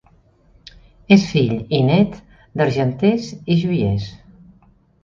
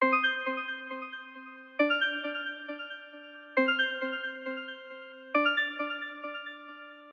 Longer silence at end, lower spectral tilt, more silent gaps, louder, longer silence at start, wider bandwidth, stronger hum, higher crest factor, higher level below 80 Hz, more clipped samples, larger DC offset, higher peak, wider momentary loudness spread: first, 0.85 s vs 0 s; first, -7.5 dB/octave vs -3 dB/octave; neither; first, -18 LUFS vs -31 LUFS; first, 1.1 s vs 0 s; about the same, 7.4 kHz vs 7.4 kHz; neither; about the same, 18 dB vs 20 dB; first, -46 dBFS vs under -90 dBFS; neither; neither; first, 0 dBFS vs -12 dBFS; second, 10 LU vs 19 LU